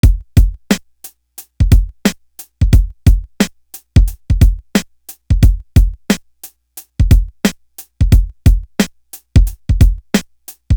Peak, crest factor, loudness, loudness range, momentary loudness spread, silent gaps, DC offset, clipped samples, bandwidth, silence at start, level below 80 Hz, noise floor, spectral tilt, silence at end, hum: 0 dBFS; 12 dB; -15 LUFS; 2 LU; 22 LU; none; under 0.1%; under 0.1%; over 20 kHz; 0.05 s; -16 dBFS; -40 dBFS; -6 dB/octave; 0 s; none